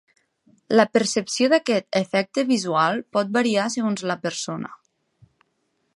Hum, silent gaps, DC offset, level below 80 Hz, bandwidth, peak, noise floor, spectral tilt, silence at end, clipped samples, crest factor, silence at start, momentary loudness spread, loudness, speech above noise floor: none; none; under 0.1%; -72 dBFS; 11.5 kHz; -2 dBFS; -71 dBFS; -4 dB/octave; 1.2 s; under 0.1%; 20 dB; 0.7 s; 9 LU; -22 LUFS; 50 dB